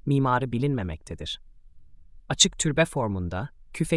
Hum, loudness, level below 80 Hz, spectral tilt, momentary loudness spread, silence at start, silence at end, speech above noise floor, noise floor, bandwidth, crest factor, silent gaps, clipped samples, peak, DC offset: none; -25 LUFS; -46 dBFS; -4 dB/octave; 15 LU; 0.05 s; 0 s; 22 dB; -47 dBFS; 12 kHz; 20 dB; none; under 0.1%; -6 dBFS; under 0.1%